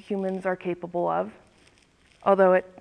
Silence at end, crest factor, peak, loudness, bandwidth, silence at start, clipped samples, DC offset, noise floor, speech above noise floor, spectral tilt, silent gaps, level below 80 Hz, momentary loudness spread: 0.15 s; 18 dB; -8 dBFS; -25 LUFS; 9.4 kHz; 0.1 s; under 0.1%; under 0.1%; -60 dBFS; 36 dB; -8 dB/octave; none; -66 dBFS; 11 LU